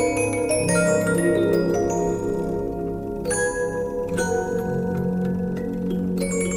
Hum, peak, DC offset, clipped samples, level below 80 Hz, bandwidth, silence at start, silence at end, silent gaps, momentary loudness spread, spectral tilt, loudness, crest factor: none; -8 dBFS; under 0.1%; under 0.1%; -42 dBFS; 16 kHz; 0 s; 0 s; none; 7 LU; -5.5 dB/octave; -23 LUFS; 14 dB